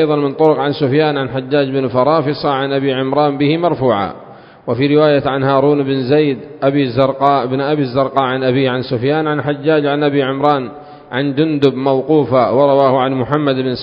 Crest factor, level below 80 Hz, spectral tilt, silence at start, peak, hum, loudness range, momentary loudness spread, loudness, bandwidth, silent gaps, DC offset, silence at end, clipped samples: 14 dB; -50 dBFS; -9 dB/octave; 0 s; 0 dBFS; none; 2 LU; 6 LU; -14 LUFS; 5.4 kHz; none; under 0.1%; 0 s; under 0.1%